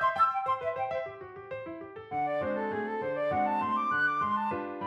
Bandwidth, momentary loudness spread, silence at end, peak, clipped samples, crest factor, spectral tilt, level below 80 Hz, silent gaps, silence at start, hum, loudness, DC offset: 11.5 kHz; 14 LU; 0 s; -16 dBFS; under 0.1%; 16 dB; -6.5 dB/octave; -68 dBFS; none; 0 s; none; -31 LUFS; under 0.1%